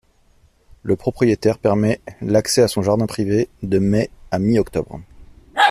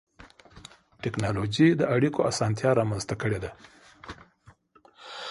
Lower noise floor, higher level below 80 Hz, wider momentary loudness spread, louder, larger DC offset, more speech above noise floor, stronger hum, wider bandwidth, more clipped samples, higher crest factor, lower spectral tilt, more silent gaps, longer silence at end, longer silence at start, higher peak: second, -55 dBFS vs -59 dBFS; first, -44 dBFS vs -54 dBFS; second, 9 LU vs 23 LU; first, -19 LUFS vs -26 LUFS; neither; first, 37 dB vs 33 dB; neither; first, 15 kHz vs 11.5 kHz; neither; about the same, 18 dB vs 20 dB; about the same, -5.5 dB/octave vs -6 dB/octave; neither; about the same, 0 s vs 0 s; first, 0.85 s vs 0.2 s; first, -2 dBFS vs -8 dBFS